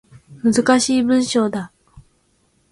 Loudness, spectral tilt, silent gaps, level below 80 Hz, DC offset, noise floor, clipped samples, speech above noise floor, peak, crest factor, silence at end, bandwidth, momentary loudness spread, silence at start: -17 LUFS; -4 dB/octave; none; -56 dBFS; under 0.1%; -62 dBFS; under 0.1%; 45 dB; -4 dBFS; 16 dB; 0.7 s; 11.5 kHz; 11 LU; 0.3 s